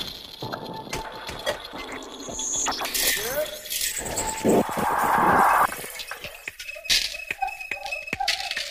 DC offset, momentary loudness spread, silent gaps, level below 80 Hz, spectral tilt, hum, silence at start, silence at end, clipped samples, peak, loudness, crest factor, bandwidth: under 0.1%; 15 LU; none; -50 dBFS; -2 dB/octave; none; 0 s; 0 s; under 0.1%; -6 dBFS; -25 LUFS; 20 dB; 16 kHz